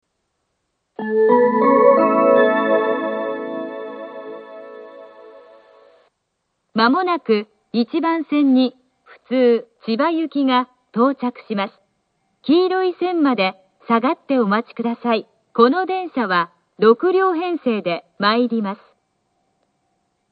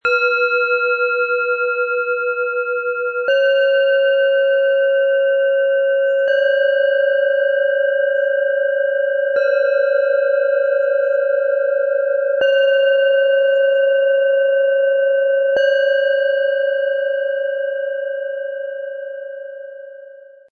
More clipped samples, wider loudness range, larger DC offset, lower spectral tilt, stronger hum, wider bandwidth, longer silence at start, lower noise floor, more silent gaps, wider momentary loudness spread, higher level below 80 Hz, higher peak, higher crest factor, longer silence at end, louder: neither; first, 8 LU vs 4 LU; neither; first, -9 dB/octave vs -1.5 dB/octave; neither; about the same, 5 kHz vs 4.7 kHz; first, 1 s vs 0.05 s; first, -73 dBFS vs -40 dBFS; neither; first, 15 LU vs 8 LU; about the same, -74 dBFS vs -72 dBFS; first, 0 dBFS vs -6 dBFS; first, 18 dB vs 10 dB; first, 1.55 s vs 0.3 s; about the same, -18 LUFS vs -16 LUFS